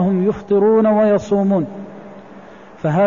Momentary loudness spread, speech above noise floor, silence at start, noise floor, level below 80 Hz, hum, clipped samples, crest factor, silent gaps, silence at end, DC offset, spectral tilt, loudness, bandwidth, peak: 20 LU; 25 dB; 0 s; -39 dBFS; -52 dBFS; none; under 0.1%; 10 dB; none; 0 s; 0.4%; -9 dB/octave; -16 LUFS; 7.4 kHz; -6 dBFS